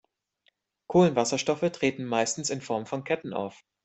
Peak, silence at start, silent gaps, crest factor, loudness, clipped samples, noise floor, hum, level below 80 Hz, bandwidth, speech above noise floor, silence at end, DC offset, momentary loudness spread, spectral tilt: -8 dBFS; 0.9 s; none; 20 dB; -27 LUFS; under 0.1%; -71 dBFS; none; -66 dBFS; 8.4 kHz; 44 dB; 0.3 s; under 0.1%; 10 LU; -4.5 dB/octave